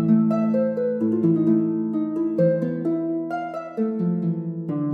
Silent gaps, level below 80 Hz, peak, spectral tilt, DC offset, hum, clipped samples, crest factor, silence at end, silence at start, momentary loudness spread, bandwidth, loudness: none; -72 dBFS; -8 dBFS; -11.5 dB/octave; under 0.1%; none; under 0.1%; 14 dB; 0 s; 0 s; 8 LU; 4.5 kHz; -23 LUFS